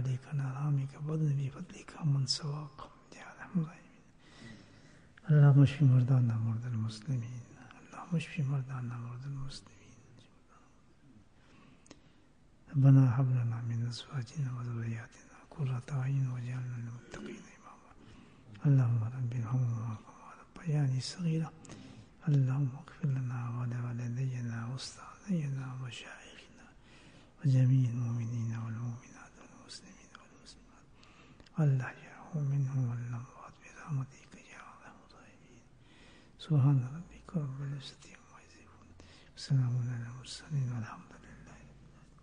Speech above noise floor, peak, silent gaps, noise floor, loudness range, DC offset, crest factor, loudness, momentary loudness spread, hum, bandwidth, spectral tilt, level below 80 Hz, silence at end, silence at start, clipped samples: 32 dB; -14 dBFS; none; -64 dBFS; 11 LU; under 0.1%; 20 dB; -33 LUFS; 24 LU; none; 9.8 kHz; -7 dB/octave; -64 dBFS; 0.45 s; 0 s; under 0.1%